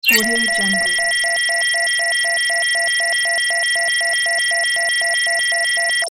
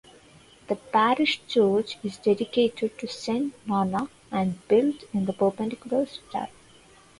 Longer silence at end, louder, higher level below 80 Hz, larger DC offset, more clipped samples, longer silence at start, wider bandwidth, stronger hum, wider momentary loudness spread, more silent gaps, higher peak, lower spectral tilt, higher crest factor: second, 0 s vs 0.75 s; first, -15 LUFS vs -26 LUFS; first, -56 dBFS vs -64 dBFS; neither; neither; second, 0.05 s vs 0.7 s; first, 17.5 kHz vs 11.5 kHz; neither; second, 0 LU vs 11 LU; neither; first, 0 dBFS vs -8 dBFS; second, 0 dB/octave vs -6 dB/octave; about the same, 18 dB vs 18 dB